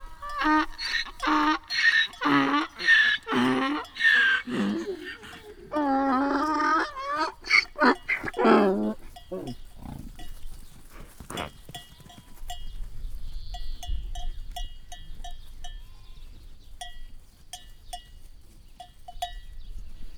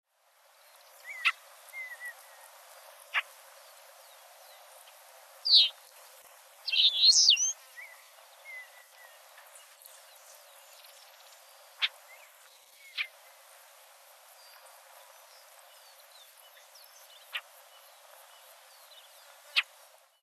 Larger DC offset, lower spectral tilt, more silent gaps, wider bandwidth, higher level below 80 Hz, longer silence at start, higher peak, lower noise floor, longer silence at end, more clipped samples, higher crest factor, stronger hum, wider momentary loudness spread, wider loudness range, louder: neither; first, -4 dB/octave vs 9 dB/octave; neither; first, 19 kHz vs 13.5 kHz; first, -40 dBFS vs under -90 dBFS; second, 0 s vs 1.05 s; first, -6 dBFS vs -10 dBFS; second, -48 dBFS vs -66 dBFS; second, 0 s vs 0.6 s; neither; about the same, 22 dB vs 26 dB; neither; second, 24 LU vs 31 LU; about the same, 23 LU vs 24 LU; about the same, -24 LUFS vs -26 LUFS